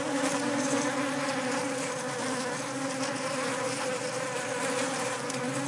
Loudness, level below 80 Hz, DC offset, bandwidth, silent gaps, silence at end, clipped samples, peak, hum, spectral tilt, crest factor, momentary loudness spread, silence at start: -30 LUFS; -82 dBFS; under 0.1%; 11.5 kHz; none; 0 s; under 0.1%; -14 dBFS; none; -3 dB/octave; 16 dB; 4 LU; 0 s